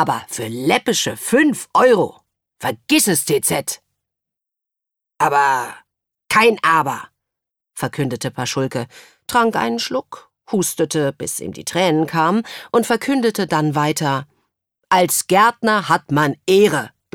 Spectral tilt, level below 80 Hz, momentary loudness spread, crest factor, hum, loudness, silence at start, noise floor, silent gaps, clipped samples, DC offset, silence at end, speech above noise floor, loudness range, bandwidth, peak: -4 dB/octave; -60 dBFS; 11 LU; 18 dB; none; -17 LUFS; 0 s; -84 dBFS; none; under 0.1%; under 0.1%; 0.25 s; 67 dB; 4 LU; 18.5 kHz; 0 dBFS